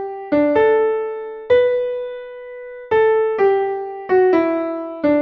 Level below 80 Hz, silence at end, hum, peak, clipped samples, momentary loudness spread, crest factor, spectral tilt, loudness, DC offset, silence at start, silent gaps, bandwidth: -56 dBFS; 0 s; none; -4 dBFS; under 0.1%; 15 LU; 14 dB; -7.5 dB/octave; -17 LUFS; under 0.1%; 0 s; none; 5.8 kHz